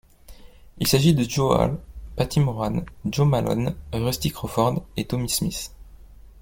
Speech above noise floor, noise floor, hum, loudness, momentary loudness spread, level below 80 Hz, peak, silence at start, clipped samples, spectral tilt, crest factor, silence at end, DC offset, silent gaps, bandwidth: 23 dB; -45 dBFS; none; -23 LUFS; 9 LU; -42 dBFS; -4 dBFS; 0.3 s; under 0.1%; -5.5 dB/octave; 20 dB; 0 s; under 0.1%; none; 17 kHz